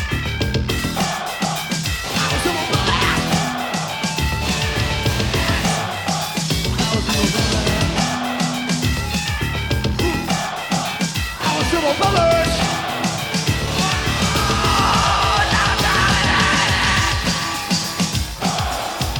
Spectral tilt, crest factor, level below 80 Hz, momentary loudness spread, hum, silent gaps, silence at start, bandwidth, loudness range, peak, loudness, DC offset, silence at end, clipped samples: -3.5 dB/octave; 16 dB; -30 dBFS; 6 LU; none; none; 0 s; 19.5 kHz; 4 LU; -2 dBFS; -18 LUFS; under 0.1%; 0 s; under 0.1%